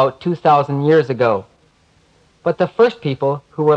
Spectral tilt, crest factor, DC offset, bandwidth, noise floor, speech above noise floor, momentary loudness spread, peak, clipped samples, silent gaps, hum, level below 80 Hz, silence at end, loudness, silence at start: -8 dB/octave; 16 dB; under 0.1%; 7.4 kHz; -55 dBFS; 40 dB; 7 LU; -2 dBFS; under 0.1%; none; none; -60 dBFS; 0 s; -17 LUFS; 0 s